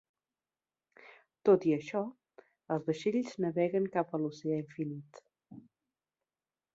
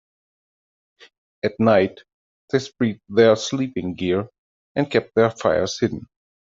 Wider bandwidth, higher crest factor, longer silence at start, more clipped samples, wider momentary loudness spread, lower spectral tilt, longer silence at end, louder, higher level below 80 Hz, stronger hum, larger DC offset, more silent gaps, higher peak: about the same, 7.8 kHz vs 7.8 kHz; about the same, 20 dB vs 20 dB; about the same, 1.45 s vs 1.45 s; neither; about the same, 12 LU vs 10 LU; first, -7.5 dB/octave vs -5.5 dB/octave; first, 1.15 s vs 0.5 s; second, -33 LUFS vs -21 LUFS; second, -80 dBFS vs -60 dBFS; neither; neither; second, none vs 2.14-2.48 s, 4.38-4.75 s; second, -14 dBFS vs -4 dBFS